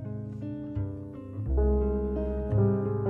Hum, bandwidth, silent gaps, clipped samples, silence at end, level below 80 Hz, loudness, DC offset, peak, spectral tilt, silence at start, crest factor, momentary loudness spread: none; 2.8 kHz; none; under 0.1%; 0 s; -34 dBFS; -30 LUFS; under 0.1%; -14 dBFS; -12.5 dB/octave; 0 s; 14 dB; 11 LU